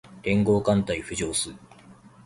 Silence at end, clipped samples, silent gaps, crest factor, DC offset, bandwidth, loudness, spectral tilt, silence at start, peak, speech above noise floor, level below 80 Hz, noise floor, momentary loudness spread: 0.35 s; under 0.1%; none; 18 dB; under 0.1%; 11.5 kHz; -25 LUFS; -5 dB/octave; 0.05 s; -8 dBFS; 26 dB; -48 dBFS; -50 dBFS; 7 LU